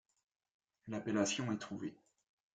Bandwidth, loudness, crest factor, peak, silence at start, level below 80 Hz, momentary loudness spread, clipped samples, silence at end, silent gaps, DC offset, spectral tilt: 9.4 kHz; -39 LUFS; 22 dB; -20 dBFS; 0.85 s; -78 dBFS; 12 LU; under 0.1%; 0.6 s; none; under 0.1%; -4 dB/octave